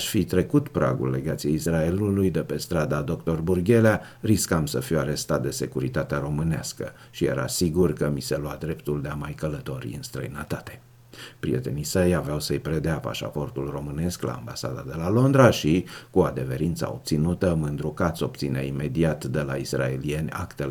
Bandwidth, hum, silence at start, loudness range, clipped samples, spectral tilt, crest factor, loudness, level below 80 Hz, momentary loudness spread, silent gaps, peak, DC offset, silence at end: 18.5 kHz; none; 0 s; 5 LU; under 0.1%; -6 dB/octave; 22 dB; -25 LUFS; -44 dBFS; 10 LU; none; -2 dBFS; under 0.1%; 0 s